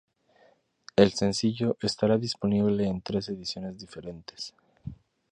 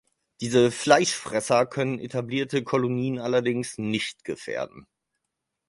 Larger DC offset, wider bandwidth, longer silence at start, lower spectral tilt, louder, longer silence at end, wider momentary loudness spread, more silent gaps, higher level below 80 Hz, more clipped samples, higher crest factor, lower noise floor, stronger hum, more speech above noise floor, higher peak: neither; about the same, 10.5 kHz vs 11.5 kHz; first, 1 s vs 0.4 s; about the same, -5.5 dB/octave vs -4.5 dB/octave; about the same, -27 LUFS vs -25 LUFS; second, 0.35 s vs 0.85 s; first, 19 LU vs 12 LU; neither; first, -56 dBFS vs -64 dBFS; neither; about the same, 24 dB vs 24 dB; second, -63 dBFS vs -82 dBFS; neither; second, 36 dB vs 58 dB; second, -6 dBFS vs -2 dBFS